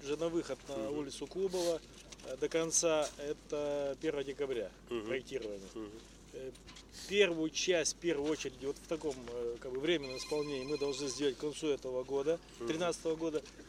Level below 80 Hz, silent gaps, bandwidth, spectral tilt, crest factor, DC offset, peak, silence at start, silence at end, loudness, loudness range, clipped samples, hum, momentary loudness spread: -62 dBFS; none; 15.5 kHz; -3 dB/octave; 22 dB; under 0.1%; -14 dBFS; 0 s; 0 s; -36 LUFS; 4 LU; under 0.1%; none; 16 LU